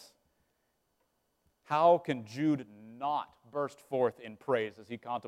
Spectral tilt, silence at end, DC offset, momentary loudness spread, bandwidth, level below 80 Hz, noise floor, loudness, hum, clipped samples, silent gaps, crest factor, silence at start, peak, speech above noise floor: -7 dB/octave; 0 s; under 0.1%; 14 LU; 13.5 kHz; -80 dBFS; -78 dBFS; -32 LUFS; none; under 0.1%; none; 20 dB; 1.7 s; -14 dBFS; 46 dB